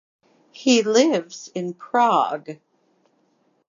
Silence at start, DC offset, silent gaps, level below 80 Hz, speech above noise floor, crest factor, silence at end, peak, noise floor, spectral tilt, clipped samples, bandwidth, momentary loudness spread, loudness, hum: 0.6 s; under 0.1%; none; -82 dBFS; 45 dB; 20 dB; 1.15 s; -4 dBFS; -65 dBFS; -3.5 dB/octave; under 0.1%; 7.6 kHz; 16 LU; -20 LUFS; none